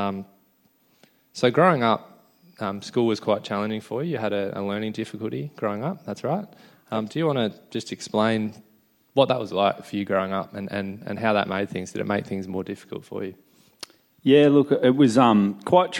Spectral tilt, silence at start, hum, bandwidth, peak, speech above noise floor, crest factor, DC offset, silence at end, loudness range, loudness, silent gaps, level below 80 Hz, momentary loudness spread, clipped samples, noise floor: -6.5 dB/octave; 0 s; none; 16.5 kHz; -4 dBFS; 40 dB; 20 dB; under 0.1%; 0 s; 7 LU; -24 LUFS; none; -68 dBFS; 15 LU; under 0.1%; -63 dBFS